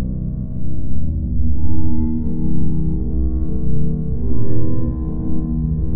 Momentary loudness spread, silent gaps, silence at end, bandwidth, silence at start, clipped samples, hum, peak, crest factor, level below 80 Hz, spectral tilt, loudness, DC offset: 4 LU; none; 0 s; 1.8 kHz; 0 s; under 0.1%; none; -2 dBFS; 10 dB; -24 dBFS; -15 dB/octave; -22 LUFS; under 0.1%